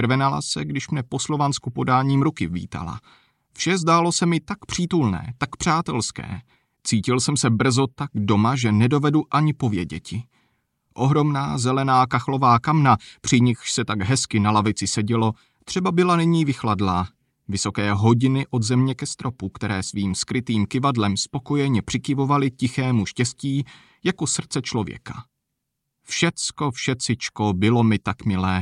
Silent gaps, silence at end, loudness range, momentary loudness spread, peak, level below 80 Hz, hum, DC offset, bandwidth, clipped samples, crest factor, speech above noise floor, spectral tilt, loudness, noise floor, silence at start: none; 0 s; 4 LU; 10 LU; -4 dBFS; -52 dBFS; none; under 0.1%; 11.5 kHz; under 0.1%; 18 dB; 58 dB; -5 dB/octave; -22 LUFS; -79 dBFS; 0 s